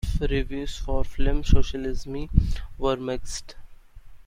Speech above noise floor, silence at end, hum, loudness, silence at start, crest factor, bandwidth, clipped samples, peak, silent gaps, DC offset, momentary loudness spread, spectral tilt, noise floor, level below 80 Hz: 21 dB; 0.1 s; none; -28 LUFS; 0.05 s; 20 dB; 10.5 kHz; under 0.1%; -2 dBFS; none; under 0.1%; 9 LU; -6 dB/octave; -43 dBFS; -28 dBFS